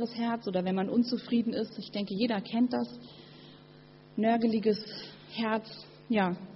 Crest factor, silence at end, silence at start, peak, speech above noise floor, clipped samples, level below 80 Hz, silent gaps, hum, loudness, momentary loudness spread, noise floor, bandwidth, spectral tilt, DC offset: 16 dB; 0 s; 0 s; -16 dBFS; 24 dB; under 0.1%; -72 dBFS; none; none; -31 LUFS; 19 LU; -54 dBFS; 6 kHz; -5 dB/octave; under 0.1%